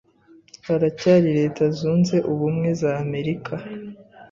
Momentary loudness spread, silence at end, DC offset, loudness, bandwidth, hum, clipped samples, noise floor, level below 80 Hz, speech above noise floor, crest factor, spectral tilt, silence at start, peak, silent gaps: 16 LU; 0.05 s; under 0.1%; -21 LUFS; 7.4 kHz; none; under 0.1%; -53 dBFS; -58 dBFS; 32 dB; 18 dB; -7.5 dB/octave; 0.65 s; -4 dBFS; none